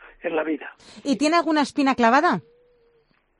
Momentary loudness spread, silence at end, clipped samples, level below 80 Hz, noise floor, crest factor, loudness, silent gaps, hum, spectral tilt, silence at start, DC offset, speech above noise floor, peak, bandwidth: 13 LU; 1 s; under 0.1%; -62 dBFS; -63 dBFS; 18 dB; -21 LUFS; none; none; -4.5 dB/octave; 0.25 s; under 0.1%; 42 dB; -4 dBFS; 10.5 kHz